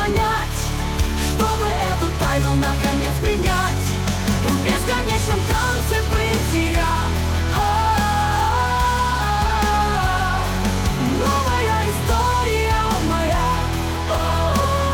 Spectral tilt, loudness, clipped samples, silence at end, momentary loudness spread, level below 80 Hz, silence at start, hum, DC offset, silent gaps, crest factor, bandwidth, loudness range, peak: -5 dB/octave; -20 LUFS; under 0.1%; 0 s; 3 LU; -26 dBFS; 0 s; none; under 0.1%; none; 12 dB; 19 kHz; 1 LU; -6 dBFS